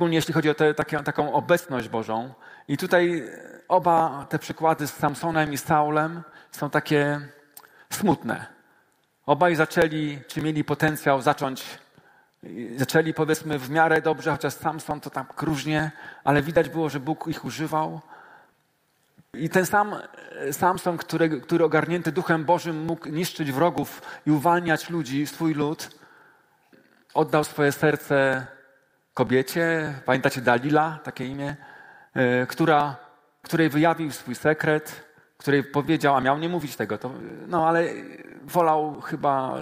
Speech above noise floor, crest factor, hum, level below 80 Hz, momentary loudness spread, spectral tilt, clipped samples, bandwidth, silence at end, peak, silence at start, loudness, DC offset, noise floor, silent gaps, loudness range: 44 dB; 22 dB; none; -60 dBFS; 12 LU; -5.5 dB/octave; under 0.1%; 16 kHz; 0 s; -2 dBFS; 0 s; -24 LUFS; under 0.1%; -68 dBFS; none; 3 LU